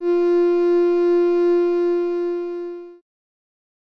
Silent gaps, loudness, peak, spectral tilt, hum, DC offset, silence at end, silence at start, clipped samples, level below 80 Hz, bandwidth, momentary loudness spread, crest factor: none; -19 LUFS; -12 dBFS; -6 dB/octave; none; under 0.1%; 1.05 s; 0 s; under 0.1%; -72 dBFS; 5.6 kHz; 12 LU; 8 dB